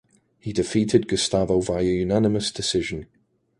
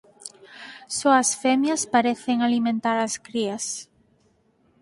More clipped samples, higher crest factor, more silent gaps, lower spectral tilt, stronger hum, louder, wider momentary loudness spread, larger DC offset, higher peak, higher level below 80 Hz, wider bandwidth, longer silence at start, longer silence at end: neither; about the same, 20 dB vs 20 dB; neither; first, -5 dB/octave vs -2.5 dB/octave; neither; about the same, -23 LUFS vs -23 LUFS; second, 9 LU vs 22 LU; neither; about the same, -4 dBFS vs -4 dBFS; first, -46 dBFS vs -70 dBFS; about the same, 11.5 kHz vs 11.5 kHz; first, 0.45 s vs 0.2 s; second, 0.55 s vs 1 s